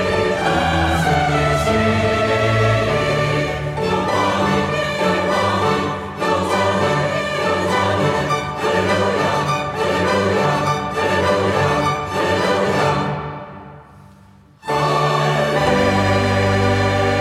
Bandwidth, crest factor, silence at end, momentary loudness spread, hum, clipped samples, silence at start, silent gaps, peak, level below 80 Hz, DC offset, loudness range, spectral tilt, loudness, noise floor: 16 kHz; 14 dB; 0 s; 4 LU; none; under 0.1%; 0 s; none; -4 dBFS; -40 dBFS; under 0.1%; 3 LU; -5.5 dB/octave; -17 LUFS; -47 dBFS